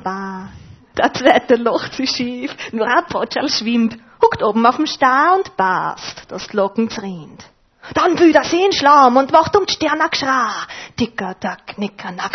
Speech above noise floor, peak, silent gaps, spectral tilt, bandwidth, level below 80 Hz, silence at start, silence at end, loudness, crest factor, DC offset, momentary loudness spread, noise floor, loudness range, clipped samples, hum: 23 dB; 0 dBFS; none; -4 dB/octave; 6.4 kHz; -52 dBFS; 0 s; 0 s; -16 LUFS; 16 dB; under 0.1%; 15 LU; -39 dBFS; 4 LU; under 0.1%; none